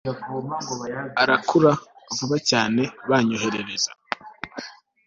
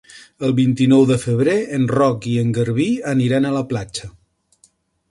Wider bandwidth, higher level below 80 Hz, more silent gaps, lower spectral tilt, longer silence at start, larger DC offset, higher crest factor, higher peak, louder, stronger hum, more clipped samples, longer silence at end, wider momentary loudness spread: second, 7.8 kHz vs 11.5 kHz; second, -62 dBFS vs -52 dBFS; neither; second, -4 dB/octave vs -7 dB/octave; about the same, 0.05 s vs 0.15 s; neither; about the same, 20 dB vs 16 dB; about the same, -2 dBFS vs -2 dBFS; second, -23 LUFS vs -17 LUFS; neither; neither; second, 0.35 s vs 1 s; first, 15 LU vs 10 LU